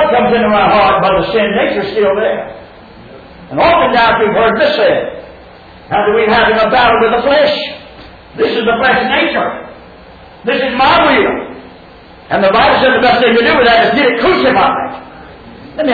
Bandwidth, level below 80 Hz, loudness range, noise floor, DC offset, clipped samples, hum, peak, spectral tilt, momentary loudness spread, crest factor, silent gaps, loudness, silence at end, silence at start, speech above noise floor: 4.9 kHz; -38 dBFS; 4 LU; -36 dBFS; under 0.1%; under 0.1%; none; 0 dBFS; -7 dB/octave; 13 LU; 12 dB; none; -10 LUFS; 0 s; 0 s; 26 dB